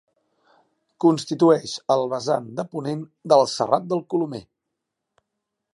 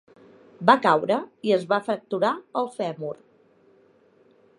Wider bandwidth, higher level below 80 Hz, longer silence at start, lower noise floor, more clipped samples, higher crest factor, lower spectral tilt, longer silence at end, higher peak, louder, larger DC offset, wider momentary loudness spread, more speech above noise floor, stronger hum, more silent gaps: about the same, 11.5 kHz vs 11 kHz; first, -70 dBFS vs -78 dBFS; first, 1 s vs 0.6 s; first, -81 dBFS vs -59 dBFS; neither; about the same, 20 dB vs 24 dB; about the same, -6 dB/octave vs -6 dB/octave; second, 1.3 s vs 1.45 s; about the same, -2 dBFS vs -2 dBFS; about the same, -22 LUFS vs -24 LUFS; neither; about the same, 12 LU vs 12 LU; first, 60 dB vs 35 dB; neither; neither